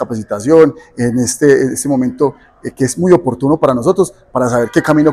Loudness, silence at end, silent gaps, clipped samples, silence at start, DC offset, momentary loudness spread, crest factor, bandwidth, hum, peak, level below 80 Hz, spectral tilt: -13 LUFS; 0 s; none; 0.7%; 0 s; under 0.1%; 9 LU; 12 dB; 15 kHz; none; 0 dBFS; -46 dBFS; -6 dB/octave